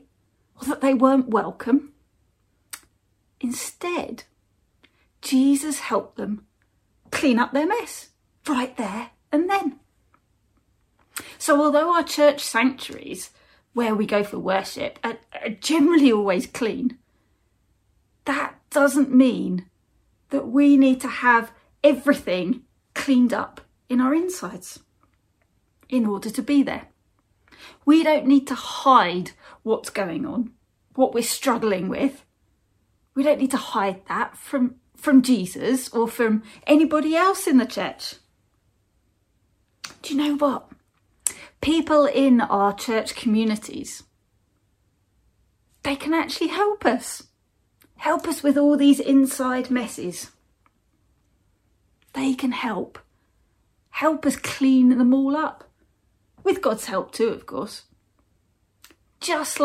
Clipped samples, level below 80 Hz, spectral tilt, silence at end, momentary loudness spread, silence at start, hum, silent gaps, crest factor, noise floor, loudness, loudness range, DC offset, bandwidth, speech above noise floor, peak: under 0.1%; -62 dBFS; -4.5 dB/octave; 0 s; 17 LU; 0.6 s; none; none; 22 dB; -67 dBFS; -22 LUFS; 8 LU; under 0.1%; 15.5 kHz; 46 dB; -2 dBFS